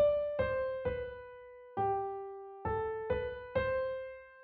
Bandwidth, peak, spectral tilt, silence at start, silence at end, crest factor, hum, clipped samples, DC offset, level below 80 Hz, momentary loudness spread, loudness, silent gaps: 4.6 kHz; -20 dBFS; -4.5 dB/octave; 0 s; 0 s; 14 dB; none; under 0.1%; under 0.1%; -54 dBFS; 13 LU; -36 LUFS; none